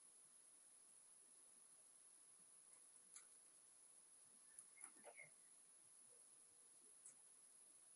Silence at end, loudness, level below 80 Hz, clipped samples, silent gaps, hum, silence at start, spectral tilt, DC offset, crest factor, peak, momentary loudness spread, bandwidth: 0 s; -65 LUFS; under -90 dBFS; under 0.1%; none; none; 0 s; 0.5 dB/octave; under 0.1%; 26 dB; -42 dBFS; 5 LU; 11.5 kHz